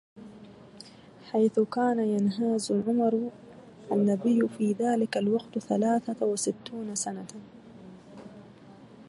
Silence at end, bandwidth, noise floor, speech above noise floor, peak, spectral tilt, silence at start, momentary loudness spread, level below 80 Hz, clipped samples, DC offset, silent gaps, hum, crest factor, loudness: 0.05 s; 11.5 kHz; -51 dBFS; 24 dB; -12 dBFS; -5.5 dB/octave; 0.15 s; 23 LU; -72 dBFS; under 0.1%; under 0.1%; none; none; 16 dB; -28 LUFS